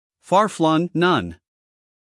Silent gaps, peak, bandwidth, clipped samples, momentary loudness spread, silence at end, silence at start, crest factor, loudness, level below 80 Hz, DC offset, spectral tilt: none; -4 dBFS; 12 kHz; under 0.1%; 4 LU; 0.85 s; 0.3 s; 18 dB; -19 LUFS; -62 dBFS; under 0.1%; -6 dB/octave